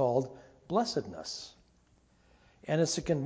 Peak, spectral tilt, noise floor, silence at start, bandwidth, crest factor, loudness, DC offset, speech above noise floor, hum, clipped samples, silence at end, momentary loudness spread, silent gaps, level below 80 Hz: -14 dBFS; -5 dB/octave; -66 dBFS; 0 s; 8 kHz; 20 dB; -33 LUFS; under 0.1%; 35 dB; none; under 0.1%; 0 s; 20 LU; none; -62 dBFS